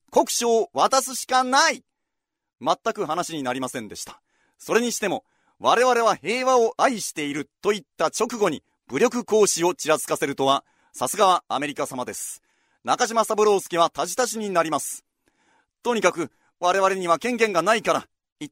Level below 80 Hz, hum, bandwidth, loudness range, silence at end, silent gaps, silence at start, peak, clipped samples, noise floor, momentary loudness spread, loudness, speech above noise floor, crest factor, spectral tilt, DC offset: -68 dBFS; none; 16 kHz; 3 LU; 0.05 s; 18.32-18.36 s; 0.1 s; -2 dBFS; under 0.1%; -81 dBFS; 13 LU; -22 LUFS; 59 dB; 20 dB; -2.5 dB/octave; under 0.1%